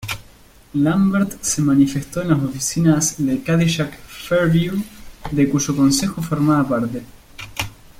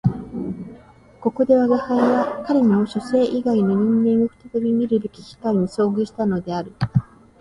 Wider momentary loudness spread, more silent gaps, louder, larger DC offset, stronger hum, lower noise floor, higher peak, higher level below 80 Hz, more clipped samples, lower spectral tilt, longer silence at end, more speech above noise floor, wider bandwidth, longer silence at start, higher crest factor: about the same, 13 LU vs 12 LU; neither; about the same, -19 LUFS vs -20 LUFS; neither; neither; about the same, -47 dBFS vs -46 dBFS; about the same, -2 dBFS vs -4 dBFS; first, -44 dBFS vs -50 dBFS; neither; second, -5 dB/octave vs -8.5 dB/octave; about the same, 0.3 s vs 0.4 s; about the same, 29 dB vs 27 dB; first, 16.5 kHz vs 10.5 kHz; about the same, 0 s vs 0.05 s; about the same, 16 dB vs 16 dB